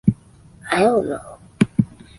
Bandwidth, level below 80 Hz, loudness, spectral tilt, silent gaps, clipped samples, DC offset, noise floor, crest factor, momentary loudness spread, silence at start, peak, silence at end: 11.5 kHz; -48 dBFS; -20 LUFS; -7 dB/octave; none; under 0.1%; under 0.1%; -47 dBFS; 18 dB; 17 LU; 0.05 s; -2 dBFS; 0.35 s